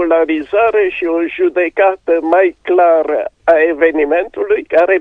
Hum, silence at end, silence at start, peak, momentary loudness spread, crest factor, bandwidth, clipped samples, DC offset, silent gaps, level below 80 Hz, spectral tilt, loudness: none; 0 s; 0 s; 0 dBFS; 5 LU; 12 dB; 5.2 kHz; under 0.1%; under 0.1%; none; -50 dBFS; -6 dB/octave; -13 LUFS